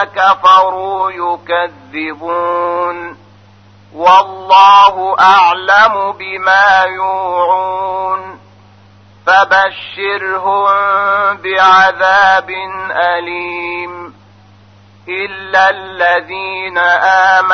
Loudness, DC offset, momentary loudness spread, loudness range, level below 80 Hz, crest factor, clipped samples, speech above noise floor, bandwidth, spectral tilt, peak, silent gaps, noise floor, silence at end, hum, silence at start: -11 LUFS; under 0.1%; 13 LU; 8 LU; -56 dBFS; 12 dB; under 0.1%; 31 dB; 6.6 kHz; -3 dB/octave; 0 dBFS; none; -42 dBFS; 0 s; none; 0 s